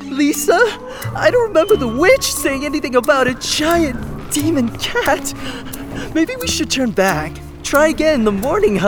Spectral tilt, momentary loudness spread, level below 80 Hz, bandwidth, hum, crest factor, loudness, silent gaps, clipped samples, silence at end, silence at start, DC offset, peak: -4 dB/octave; 13 LU; -36 dBFS; over 20 kHz; none; 14 dB; -16 LUFS; none; under 0.1%; 0 s; 0 s; under 0.1%; -2 dBFS